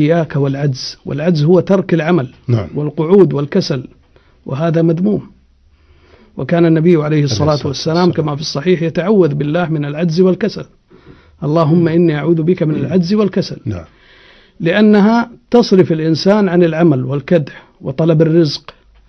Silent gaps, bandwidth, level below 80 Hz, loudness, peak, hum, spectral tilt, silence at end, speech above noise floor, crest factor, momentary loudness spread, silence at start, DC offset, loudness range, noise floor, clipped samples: none; 6.4 kHz; -48 dBFS; -13 LUFS; 0 dBFS; none; -7.5 dB/octave; 0.4 s; 37 dB; 14 dB; 11 LU; 0 s; under 0.1%; 3 LU; -49 dBFS; under 0.1%